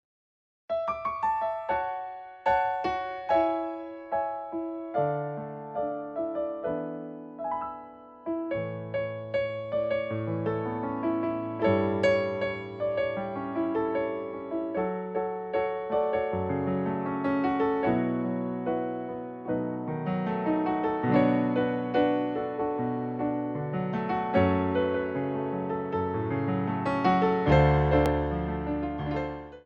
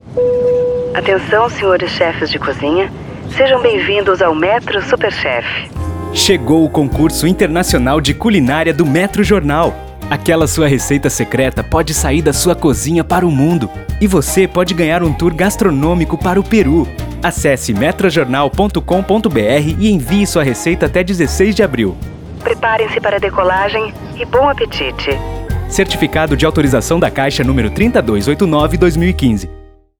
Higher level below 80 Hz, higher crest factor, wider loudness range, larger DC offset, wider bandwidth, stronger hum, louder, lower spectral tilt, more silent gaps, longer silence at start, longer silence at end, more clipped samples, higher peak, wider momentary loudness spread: second, -46 dBFS vs -26 dBFS; first, 20 dB vs 12 dB; first, 7 LU vs 2 LU; neither; second, 8.2 kHz vs over 20 kHz; neither; second, -29 LUFS vs -13 LUFS; first, -8.5 dB/octave vs -5 dB/octave; neither; first, 0.7 s vs 0.05 s; second, 0.05 s vs 0.35 s; neither; second, -10 dBFS vs 0 dBFS; first, 9 LU vs 6 LU